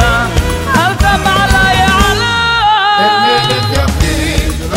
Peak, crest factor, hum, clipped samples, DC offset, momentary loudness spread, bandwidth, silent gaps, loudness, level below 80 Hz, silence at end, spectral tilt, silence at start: 0 dBFS; 10 dB; none; under 0.1%; under 0.1%; 5 LU; 16.5 kHz; none; -10 LUFS; -18 dBFS; 0 s; -4 dB/octave; 0 s